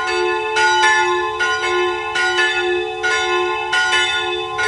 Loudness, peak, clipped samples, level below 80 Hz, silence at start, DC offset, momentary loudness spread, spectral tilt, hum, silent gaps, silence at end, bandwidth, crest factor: -16 LUFS; -2 dBFS; under 0.1%; -50 dBFS; 0 s; under 0.1%; 6 LU; -1.5 dB/octave; none; none; 0 s; 11.5 kHz; 14 dB